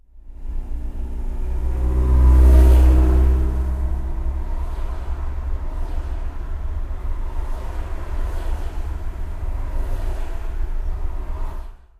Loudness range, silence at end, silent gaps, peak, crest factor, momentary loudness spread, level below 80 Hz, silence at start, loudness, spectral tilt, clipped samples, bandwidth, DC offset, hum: 13 LU; 0.25 s; none; -4 dBFS; 16 dB; 17 LU; -18 dBFS; 0.15 s; -23 LUFS; -8.5 dB/octave; under 0.1%; 3.7 kHz; under 0.1%; none